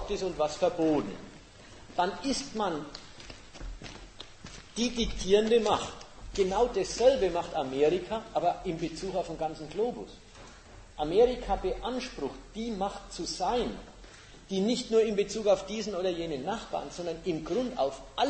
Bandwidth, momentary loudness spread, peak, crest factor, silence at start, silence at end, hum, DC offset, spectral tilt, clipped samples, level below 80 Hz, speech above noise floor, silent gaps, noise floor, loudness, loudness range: 8.8 kHz; 21 LU; -12 dBFS; 20 dB; 0 s; 0 s; none; under 0.1%; -4.5 dB/octave; under 0.1%; -48 dBFS; 21 dB; none; -51 dBFS; -30 LUFS; 7 LU